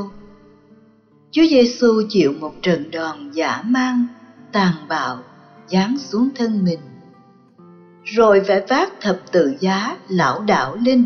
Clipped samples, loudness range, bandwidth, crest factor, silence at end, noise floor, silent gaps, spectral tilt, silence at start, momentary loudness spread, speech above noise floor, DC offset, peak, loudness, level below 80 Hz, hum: under 0.1%; 4 LU; 6.6 kHz; 14 dB; 0 s; -52 dBFS; none; -4.5 dB/octave; 0 s; 11 LU; 35 dB; under 0.1%; -4 dBFS; -18 LUFS; -58 dBFS; none